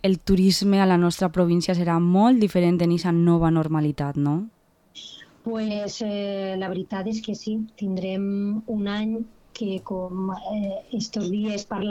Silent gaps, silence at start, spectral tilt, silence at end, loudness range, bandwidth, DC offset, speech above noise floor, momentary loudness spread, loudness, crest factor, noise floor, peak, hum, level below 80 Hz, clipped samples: none; 0.05 s; -6.5 dB/octave; 0 s; 9 LU; 14 kHz; under 0.1%; 24 dB; 12 LU; -23 LUFS; 16 dB; -47 dBFS; -8 dBFS; none; -48 dBFS; under 0.1%